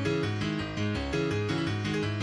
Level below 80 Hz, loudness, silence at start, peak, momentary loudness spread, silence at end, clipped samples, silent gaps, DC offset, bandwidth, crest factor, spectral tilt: -46 dBFS; -30 LUFS; 0 s; -16 dBFS; 2 LU; 0 s; under 0.1%; none; under 0.1%; 11 kHz; 14 dB; -6 dB/octave